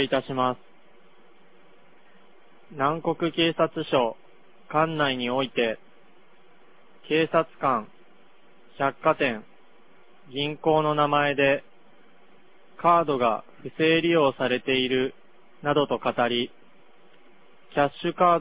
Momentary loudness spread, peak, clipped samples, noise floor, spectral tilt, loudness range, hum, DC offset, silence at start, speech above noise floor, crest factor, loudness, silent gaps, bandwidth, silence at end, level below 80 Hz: 9 LU; -6 dBFS; under 0.1%; -58 dBFS; -9 dB/octave; 5 LU; none; 0.4%; 0 s; 34 dB; 20 dB; -24 LUFS; none; 4 kHz; 0 s; -64 dBFS